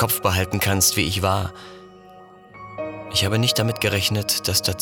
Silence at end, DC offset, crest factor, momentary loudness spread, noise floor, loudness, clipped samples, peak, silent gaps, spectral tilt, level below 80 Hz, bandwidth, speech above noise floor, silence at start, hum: 0 s; under 0.1%; 16 dB; 17 LU; -45 dBFS; -20 LUFS; under 0.1%; -6 dBFS; none; -3 dB/octave; -46 dBFS; over 20 kHz; 24 dB; 0 s; none